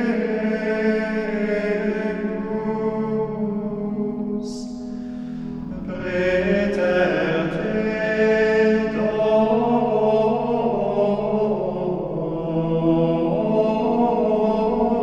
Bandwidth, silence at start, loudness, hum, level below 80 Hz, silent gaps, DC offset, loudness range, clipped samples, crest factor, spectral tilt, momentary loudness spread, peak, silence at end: 8.4 kHz; 0 s; -21 LUFS; none; -46 dBFS; none; under 0.1%; 7 LU; under 0.1%; 14 dB; -7.5 dB/octave; 9 LU; -6 dBFS; 0 s